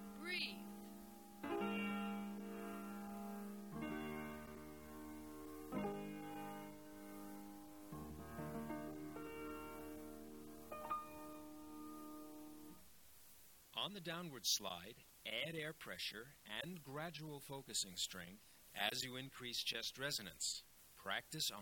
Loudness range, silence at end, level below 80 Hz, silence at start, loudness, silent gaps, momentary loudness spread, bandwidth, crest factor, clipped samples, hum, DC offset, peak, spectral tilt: 8 LU; 0 s; -72 dBFS; 0 s; -47 LUFS; none; 14 LU; 17.5 kHz; 24 dB; under 0.1%; none; under 0.1%; -24 dBFS; -2.5 dB/octave